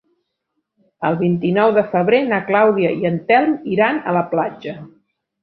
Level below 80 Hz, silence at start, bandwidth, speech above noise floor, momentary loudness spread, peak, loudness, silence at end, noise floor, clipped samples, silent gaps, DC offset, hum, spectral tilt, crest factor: -60 dBFS; 1 s; 5 kHz; 58 dB; 9 LU; -2 dBFS; -17 LUFS; 0.55 s; -74 dBFS; under 0.1%; none; under 0.1%; none; -10 dB/octave; 16 dB